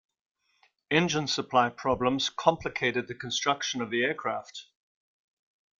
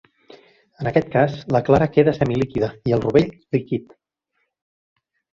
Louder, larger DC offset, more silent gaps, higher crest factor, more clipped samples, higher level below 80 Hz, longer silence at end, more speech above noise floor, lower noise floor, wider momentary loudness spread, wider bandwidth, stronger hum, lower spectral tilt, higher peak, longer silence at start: second, -28 LUFS vs -20 LUFS; neither; neither; about the same, 24 dB vs 20 dB; neither; second, -62 dBFS vs -48 dBFS; second, 1.2 s vs 1.55 s; second, 40 dB vs 54 dB; second, -69 dBFS vs -73 dBFS; about the same, 8 LU vs 8 LU; about the same, 7.6 kHz vs 7.4 kHz; neither; second, -3.5 dB/octave vs -8.5 dB/octave; second, -6 dBFS vs -2 dBFS; about the same, 0.9 s vs 0.8 s